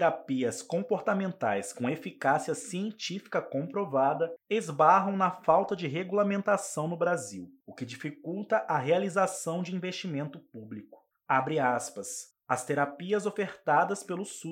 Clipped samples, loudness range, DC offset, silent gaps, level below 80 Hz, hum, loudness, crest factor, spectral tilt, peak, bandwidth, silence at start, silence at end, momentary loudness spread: under 0.1%; 5 LU; under 0.1%; none; -80 dBFS; none; -30 LUFS; 20 dB; -5 dB/octave; -10 dBFS; 16.5 kHz; 0 s; 0 s; 12 LU